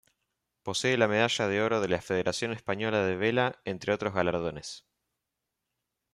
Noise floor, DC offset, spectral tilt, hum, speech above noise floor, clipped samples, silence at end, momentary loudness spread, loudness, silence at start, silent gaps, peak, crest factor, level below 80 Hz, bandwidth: -85 dBFS; under 0.1%; -4.5 dB/octave; none; 57 dB; under 0.1%; 1.35 s; 10 LU; -29 LUFS; 0.65 s; none; -10 dBFS; 20 dB; -64 dBFS; 13.5 kHz